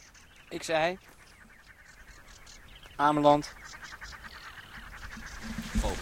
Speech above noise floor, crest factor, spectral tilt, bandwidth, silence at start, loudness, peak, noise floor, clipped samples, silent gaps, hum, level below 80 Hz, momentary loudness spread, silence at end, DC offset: 27 dB; 24 dB; -5 dB/octave; 16.5 kHz; 0.15 s; -29 LUFS; -10 dBFS; -55 dBFS; under 0.1%; none; none; -44 dBFS; 26 LU; 0 s; under 0.1%